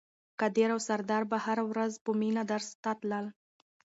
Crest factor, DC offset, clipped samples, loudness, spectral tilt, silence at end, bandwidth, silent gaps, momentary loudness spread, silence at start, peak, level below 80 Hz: 16 dB; under 0.1%; under 0.1%; -32 LUFS; -5 dB/octave; 0.55 s; 8 kHz; 2.01-2.05 s, 2.75-2.83 s; 7 LU; 0.4 s; -16 dBFS; -82 dBFS